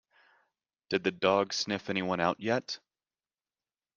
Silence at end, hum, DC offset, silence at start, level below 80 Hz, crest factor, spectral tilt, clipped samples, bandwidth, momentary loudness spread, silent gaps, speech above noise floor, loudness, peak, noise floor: 1.2 s; none; under 0.1%; 0.9 s; -74 dBFS; 24 dB; -4 dB/octave; under 0.1%; 9.8 kHz; 7 LU; none; over 60 dB; -31 LUFS; -10 dBFS; under -90 dBFS